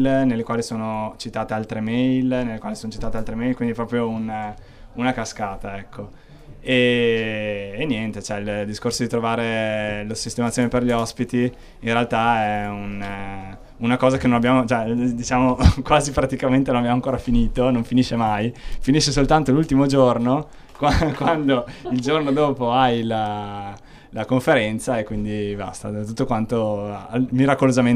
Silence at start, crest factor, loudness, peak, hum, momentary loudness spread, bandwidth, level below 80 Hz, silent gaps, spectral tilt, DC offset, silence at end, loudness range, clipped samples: 0 s; 20 dB; -21 LUFS; 0 dBFS; none; 12 LU; 13 kHz; -34 dBFS; none; -6 dB/octave; under 0.1%; 0 s; 5 LU; under 0.1%